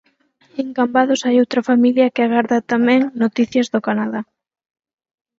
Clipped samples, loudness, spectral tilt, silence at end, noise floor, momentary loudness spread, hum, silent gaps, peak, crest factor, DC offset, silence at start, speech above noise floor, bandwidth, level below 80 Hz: under 0.1%; -17 LUFS; -5 dB/octave; 1.15 s; -58 dBFS; 10 LU; none; none; -2 dBFS; 16 dB; under 0.1%; 0.55 s; 42 dB; 7.6 kHz; -66 dBFS